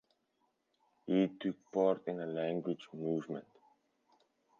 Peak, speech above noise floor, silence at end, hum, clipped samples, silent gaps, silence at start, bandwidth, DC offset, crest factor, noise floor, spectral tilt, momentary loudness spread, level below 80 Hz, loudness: -18 dBFS; 44 dB; 1.2 s; none; under 0.1%; none; 1.05 s; 7.2 kHz; under 0.1%; 20 dB; -80 dBFS; -6.5 dB/octave; 10 LU; -86 dBFS; -36 LUFS